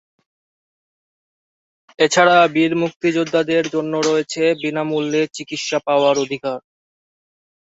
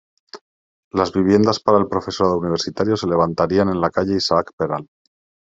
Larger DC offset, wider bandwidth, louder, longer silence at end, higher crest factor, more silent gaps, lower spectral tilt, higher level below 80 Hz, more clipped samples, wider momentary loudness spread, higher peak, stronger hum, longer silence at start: neither; about the same, 8 kHz vs 7.8 kHz; about the same, -18 LUFS vs -19 LUFS; first, 1.15 s vs 0.7 s; about the same, 18 dB vs 18 dB; second, 2.96-3.00 s vs 0.41-0.91 s, 4.53-4.58 s; second, -4 dB/octave vs -6 dB/octave; second, -66 dBFS vs -56 dBFS; neither; first, 11 LU vs 8 LU; about the same, -2 dBFS vs -2 dBFS; neither; first, 2 s vs 0.35 s